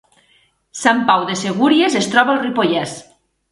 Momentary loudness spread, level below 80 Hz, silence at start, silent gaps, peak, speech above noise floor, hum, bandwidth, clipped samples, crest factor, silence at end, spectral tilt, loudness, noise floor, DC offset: 11 LU; -62 dBFS; 0.75 s; none; 0 dBFS; 42 dB; none; 11.5 kHz; under 0.1%; 16 dB; 0.5 s; -4 dB/octave; -15 LUFS; -57 dBFS; under 0.1%